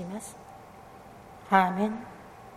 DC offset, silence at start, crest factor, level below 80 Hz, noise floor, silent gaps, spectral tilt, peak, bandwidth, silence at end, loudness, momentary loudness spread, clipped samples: under 0.1%; 0 s; 26 dB; -64 dBFS; -49 dBFS; none; -5.5 dB/octave; -6 dBFS; 15 kHz; 0 s; -27 LUFS; 25 LU; under 0.1%